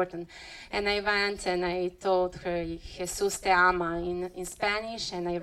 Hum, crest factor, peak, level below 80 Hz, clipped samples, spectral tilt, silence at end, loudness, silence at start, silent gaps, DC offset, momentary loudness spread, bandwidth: none; 18 dB; -10 dBFS; -50 dBFS; under 0.1%; -3.5 dB/octave; 0 s; -29 LUFS; 0 s; none; under 0.1%; 13 LU; 15.5 kHz